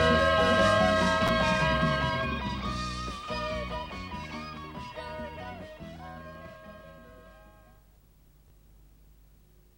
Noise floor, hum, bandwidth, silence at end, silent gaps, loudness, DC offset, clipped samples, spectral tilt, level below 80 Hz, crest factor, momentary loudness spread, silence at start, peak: -59 dBFS; none; 16 kHz; 2.3 s; none; -28 LUFS; under 0.1%; under 0.1%; -5 dB/octave; -44 dBFS; 18 dB; 22 LU; 0 s; -12 dBFS